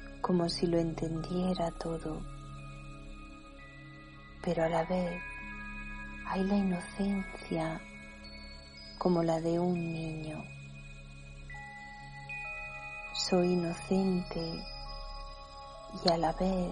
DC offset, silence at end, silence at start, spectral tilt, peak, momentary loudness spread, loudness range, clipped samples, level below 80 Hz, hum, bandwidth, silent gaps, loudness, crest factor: under 0.1%; 0 s; 0 s; -6 dB/octave; -12 dBFS; 19 LU; 5 LU; under 0.1%; -50 dBFS; none; 10.5 kHz; none; -34 LUFS; 22 dB